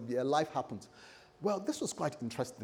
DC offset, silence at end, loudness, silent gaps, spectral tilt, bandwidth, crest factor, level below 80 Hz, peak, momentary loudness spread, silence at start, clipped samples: under 0.1%; 0 s; -36 LUFS; none; -5 dB/octave; 18.5 kHz; 18 dB; -76 dBFS; -18 dBFS; 20 LU; 0 s; under 0.1%